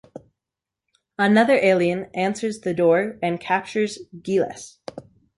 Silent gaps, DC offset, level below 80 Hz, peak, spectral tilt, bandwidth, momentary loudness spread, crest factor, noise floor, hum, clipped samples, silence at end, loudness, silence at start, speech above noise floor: none; under 0.1%; -64 dBFS; -6 dBFS; -5.5 dB/octave; 11.5 kHz; 20 LU; 16 dB; -87 dBFS; none; under 0.1%; 0.4 s; -21 LUFS; 0.15 s; 66 dB